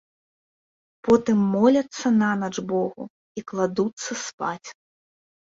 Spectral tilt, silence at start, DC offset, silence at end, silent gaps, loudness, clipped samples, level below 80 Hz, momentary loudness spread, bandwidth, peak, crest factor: -5.5 dB/octave; 1.05 s; under 0.1%; 0.85 s; 3.10-3.35 s, 3.93-3.97 s, 4.33-4.38 s; -23 LUFS; under 0.1%; -62 dBFS; 18 LU; 7.8 kHz; -6 dBFS; 20 dB